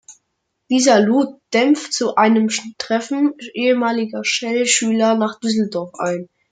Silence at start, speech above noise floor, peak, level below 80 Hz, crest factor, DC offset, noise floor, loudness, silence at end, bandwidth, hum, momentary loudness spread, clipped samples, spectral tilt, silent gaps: 0.1 s; 56 dB; -2 dBFS; -68 dBFS; 16 dB; under 0.1%; -73 dBFS; -17 LUFS; 0.25 s; 9.6 kHz; none; 9 LU; under 0.1%; -3.5 dB/octave; none